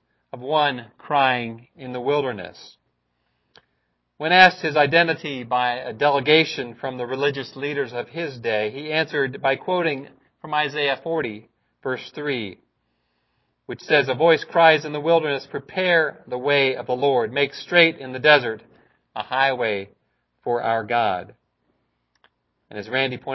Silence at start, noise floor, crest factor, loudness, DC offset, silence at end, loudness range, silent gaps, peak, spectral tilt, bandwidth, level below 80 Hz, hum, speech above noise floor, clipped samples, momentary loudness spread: 0.35 s; -72 dBFS; 22 dB; -21 LUFS; under 0.1%; 0 s; 8 LU; none; 0 dBFS; -5.5 dB/octave; 6.2 kHz; -66 dBFS; none; 51 dB; under 0.1%; 17 LU